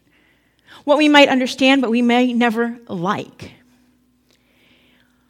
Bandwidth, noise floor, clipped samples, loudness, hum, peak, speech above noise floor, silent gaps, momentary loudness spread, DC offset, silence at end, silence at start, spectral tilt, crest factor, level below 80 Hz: 14 kHz; -59 dBFS; under 0.1%; -15 LUFS; none; 0 dBFS; 43 dB; none; 14 LU; under 0.1%; 1.8 s; 0.85 s; -4.5 dB/octave; 18 dB; -64 dBFS